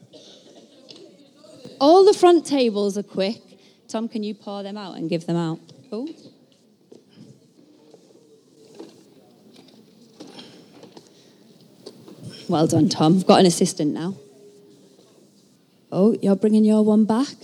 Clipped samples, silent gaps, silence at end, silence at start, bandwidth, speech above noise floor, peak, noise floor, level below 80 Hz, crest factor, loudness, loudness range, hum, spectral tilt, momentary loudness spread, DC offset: under 0.1%; none; 0.1 s; 1.65 s; 13 kHz; 37 dB; 0 dBFS; -57 dBFS; -76 dBFS; 22 dB; -19 LUFS; 12 LU; none; -6 dB/octave; 22 LU; under 0.1%